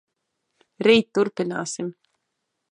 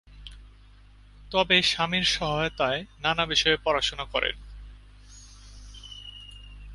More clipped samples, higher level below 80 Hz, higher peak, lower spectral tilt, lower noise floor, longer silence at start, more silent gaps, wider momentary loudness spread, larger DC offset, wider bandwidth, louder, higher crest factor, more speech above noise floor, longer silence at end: neither; second, -70 dBFS vs -46 dBFS; about the same, -4 dBFS vs -6 dBFS; first, -4.5 dB/octave vs -3 dB/octave; first, -78 dBFS vs -52 dBFS; first, 0.8 s vs 0.1 s; neither; second, 13 LU vs 25 LU; neither; about the same, 10.5 kHz vs 11.5 kHz; about the same, -22 LUFS vs -24 LUFS; about the same, 22 dB vs 22 dB; first, 57 dB vs 26 dB; first, 0.8 s vs 0 s